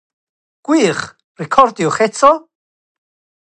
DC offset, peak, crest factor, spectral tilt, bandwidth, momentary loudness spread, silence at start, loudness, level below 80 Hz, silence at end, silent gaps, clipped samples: under 0.1%; 0 dBFS; 16 dB; -4.5 dB/octave; 9.6 kHz; 18 LU; 0.7 s; -14 LUFS; -56 dBFS; 1.05 s; 1.24-1.35 s; under 0.1%